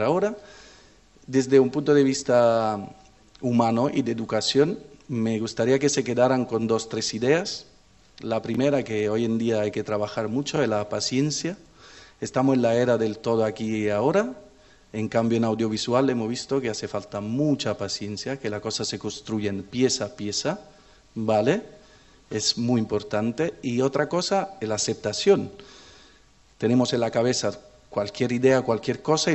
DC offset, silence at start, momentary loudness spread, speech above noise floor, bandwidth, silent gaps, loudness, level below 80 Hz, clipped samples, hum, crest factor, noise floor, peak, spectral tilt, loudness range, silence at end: under 0.1%; 0 s; 10 LU; 33 dB; 8.4 kHz; none; -24 LUFS; -60 dBFS; under 0.1%; none; 18 dB; -57 dBFS; -6 dBFS; -5 dB/octave; 4 LU; 0 s